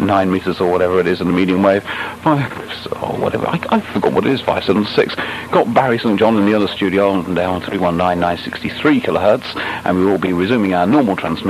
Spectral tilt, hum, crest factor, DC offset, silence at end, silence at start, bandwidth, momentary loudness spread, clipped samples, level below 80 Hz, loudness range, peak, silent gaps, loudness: -7 dB/octave; none; 16 dB; under 0.1%; 0 s; 0 s; 14 kHz; 6 LU; under 0.1%; -48 dBFS; 2 LU; 0 dBFS; none; -16 LUFS